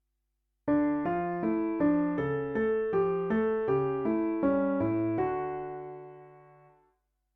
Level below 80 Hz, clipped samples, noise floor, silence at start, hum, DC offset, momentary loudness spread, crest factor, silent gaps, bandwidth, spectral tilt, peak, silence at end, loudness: -58 dBFS; under 0.1%; -80 dBFS; 0.65 s; none; under 0.1%; 11 LU; 14 dB; none; 3.8 kHz; -10.5 dB/octave; -16 dBFS; 0.95 s; -29 LUFS